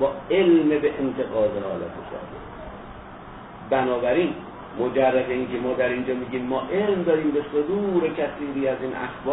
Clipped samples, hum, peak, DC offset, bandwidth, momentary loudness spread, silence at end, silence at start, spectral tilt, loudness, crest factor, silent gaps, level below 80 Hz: under 0.1%; none; -8 dBFS; under 0.1%; 4 kHz; 18 LU; 0 s; 0 s; -10.5 dB/octave; -23 LUFS; 16 dB; none; -52 dBFS